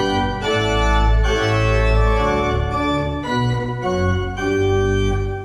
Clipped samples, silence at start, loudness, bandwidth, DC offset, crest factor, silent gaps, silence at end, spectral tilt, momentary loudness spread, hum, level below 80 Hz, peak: under 0.1%; 0 s; -19 LUFS; 9.8 kHz; under 0.1%; 14 dB; none; 0 s; -6 dB/octave; 4 LU; none; -22 dBFS; -4 dBFS